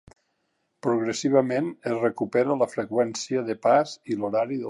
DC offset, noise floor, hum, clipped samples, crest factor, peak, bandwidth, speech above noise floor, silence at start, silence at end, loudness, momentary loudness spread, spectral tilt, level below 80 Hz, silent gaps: under 0.1%; -74 dBFS; none; under 0.1%; 18 dB; -8 dBFS; 11.5 kHz; 50 dB; 0.85 s; 0 s; -25 LUFS; 7 LU; -5.5 dB/octave; -70 dBFS; none